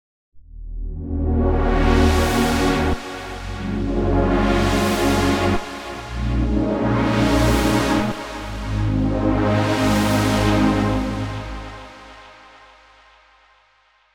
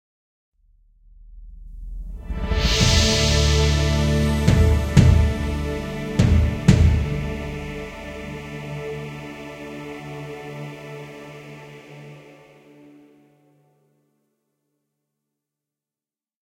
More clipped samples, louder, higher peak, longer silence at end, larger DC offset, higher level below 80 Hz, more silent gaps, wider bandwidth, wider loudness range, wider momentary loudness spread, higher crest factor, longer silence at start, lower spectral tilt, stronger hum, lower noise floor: neither; about the same, -20 LUFS vs -20 LUFS; second, -4 dBFS vs 0 dBFS; second, 1.8 s vs 4.4 s; neither; about the same, -26 dBFS vs -28 dBFS; neither; first, 19.5 kHz vs 15.5 kHz; second, 3 LU vs 19 LU; second, 13 LU vs 22 LU; second, 16 dB vs 22 dB; second, 0.35 s vs 1.3 s; about the same, -6 dB/octave vs -5 dB/octave; neither; second, -58 dBFS vs under -90 dBFS